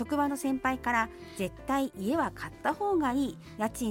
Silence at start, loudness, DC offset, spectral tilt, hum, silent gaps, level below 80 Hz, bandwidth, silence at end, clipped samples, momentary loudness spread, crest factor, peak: 0 s; -31 LUFS; under 0.1%; -5 dB/octave; none; none; -54 dBFS; 17 kHz; 0 s; under 0.1%; 7 LU; 16 dB; -14 dBFS